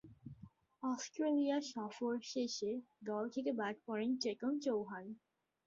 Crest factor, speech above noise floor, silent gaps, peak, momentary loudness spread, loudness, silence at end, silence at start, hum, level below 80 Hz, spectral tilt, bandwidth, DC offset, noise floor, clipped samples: 14 dB; 22 dB; none; -26 dBFS; 17 LU; -40 LUFS; 0.5 s; 0.05 s; none; -80 dBFS; -4 dB/octave; 7.6 kHz; under 0.1%; -61 dBFS; under 0.1%